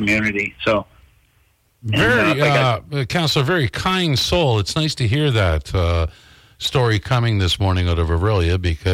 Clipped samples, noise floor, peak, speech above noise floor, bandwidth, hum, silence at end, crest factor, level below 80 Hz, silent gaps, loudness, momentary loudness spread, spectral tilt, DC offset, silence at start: under 0.1%; -59 dBFS; -6 dBFS; 42 dB; 16 kHz; none; 0 s; 12 dB; -36 dBFS; none; -18 LUFS; 6 LU; -5.5 dB/octave; under 0.1%; 0 s